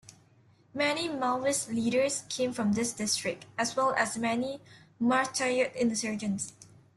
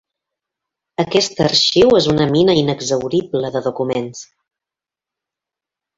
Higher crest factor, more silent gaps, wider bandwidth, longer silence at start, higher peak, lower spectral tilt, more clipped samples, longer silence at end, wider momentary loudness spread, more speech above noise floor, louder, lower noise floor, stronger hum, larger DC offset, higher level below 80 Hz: about the same, 18 dB vs 16 dB; neither; first, 12.5 kHz vs 7.8 kHz; second, 0.1 s vs 1 s; second, -12 dBFS vs -2 dBFS; second, -3 dB/octave vs -4.5 dB/octave; neither; second, 0.35 s vs 1.75 s; second, 7 LU vs 12 LU; second, 32 dB vs 72 dB; second, -30 LUFS vs -15 LUFS; second, -62 dBFS vs -88 dBFS; neither; neither; second, -70 dBFS vs -48 dBFS